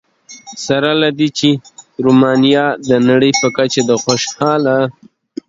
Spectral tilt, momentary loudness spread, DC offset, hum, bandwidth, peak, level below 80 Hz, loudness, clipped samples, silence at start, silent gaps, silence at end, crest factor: -4.5 dB/octave; 10 LU; under 0.1%; none; 7.8 kHz; 0 dBFS; -56 dBFS; -13 LUFS; under 0.1%; 0.3 s; none; 0.6 s; 14 dB